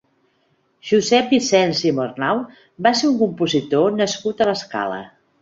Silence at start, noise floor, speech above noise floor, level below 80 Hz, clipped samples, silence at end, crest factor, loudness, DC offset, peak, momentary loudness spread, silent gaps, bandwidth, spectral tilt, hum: 0.85 s; -64 dBFS; 45 dB; -62 dBFS; under 0.1%; 0.35 s; 18 dB; -19 LUFS; under 0.1%; -2 dBFS; 9 LU; none; 8 kHz; -4.5 dB/octave; none